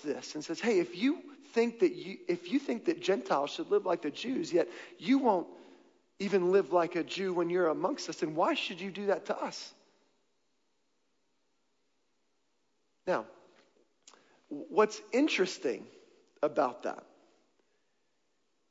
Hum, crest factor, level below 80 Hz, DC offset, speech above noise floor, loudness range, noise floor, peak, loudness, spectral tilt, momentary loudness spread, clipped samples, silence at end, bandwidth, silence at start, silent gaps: none; 20 dB; -88 dBFS; under 0.1%; 48 dB; 12 LU; -79 dBFS; -14 dBFS; -32 LUFS; -5 dB/octave; 12 LU; under 0.1%; 1.7 s; 7.8 kHz; 0 s; none